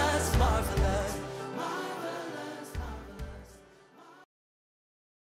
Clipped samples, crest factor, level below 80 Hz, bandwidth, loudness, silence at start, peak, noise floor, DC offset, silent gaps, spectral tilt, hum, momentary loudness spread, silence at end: under 0.1%; 18 dB; -38 dBFS; 16 kHz; -32 LUFS; 0 s; -14 dBFS; -56 dBFS; under 0.1%; none; -5 dB/octave; none; 17 LU; 1.05 s